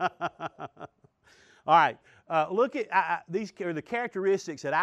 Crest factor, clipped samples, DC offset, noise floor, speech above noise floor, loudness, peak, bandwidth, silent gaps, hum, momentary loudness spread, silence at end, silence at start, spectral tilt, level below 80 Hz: 20 dB; under 0.1%; under 0.1%; -62 dBFS; 35 dB; -28 LUFS; -8 dBFS; 9 kHz; none; none; 21 LU; 0 s; 0 s; -5 dB/octave; -76 dBFS